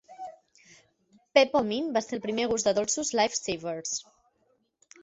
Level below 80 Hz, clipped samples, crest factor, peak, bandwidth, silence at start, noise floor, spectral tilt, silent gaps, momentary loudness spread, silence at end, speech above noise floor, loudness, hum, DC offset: -66 dBFS; under 0.1%; 24 dB; -6 dBFS; 8.2 kHz; 0.1 s; -71 dBFS; -2.5 dB/octave; none; 12 LU; 1 s; 44 dB; -27 LUFS; none; under 0.1%